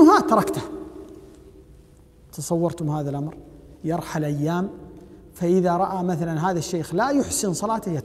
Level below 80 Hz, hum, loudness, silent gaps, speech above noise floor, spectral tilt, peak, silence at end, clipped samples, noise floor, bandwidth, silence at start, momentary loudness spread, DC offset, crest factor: -52 dBFS; none; -23 LUFS; none; 27 dB; -6 dB/octave; -2 dBFS; 0 s; under 0.1%; -50 dBFS; 16 kHz; 0 s; 18 LU; under 0.1%; 20 dB